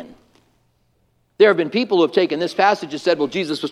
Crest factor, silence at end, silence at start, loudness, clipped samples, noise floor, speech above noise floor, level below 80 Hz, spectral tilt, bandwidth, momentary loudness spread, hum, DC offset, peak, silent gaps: 18 dB; 0 s; 0 s; -18 LUFS; under 0.1%; -63 dBFS; 46 dB; -66 dBFS; -5 dB/octave; 12 kHz; 6 LU; none; under 0.1%; 0 dBFS; none